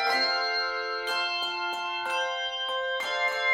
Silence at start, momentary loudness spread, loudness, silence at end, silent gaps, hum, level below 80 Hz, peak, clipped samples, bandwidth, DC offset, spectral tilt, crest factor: 0 s; 5 LU; -28 LUFS; 0 s; none; none; -68 dBFS; -14 dBFS; under 0.1%; 18 kHz; under 0.1%; 0.5 dB/octave; 14 dB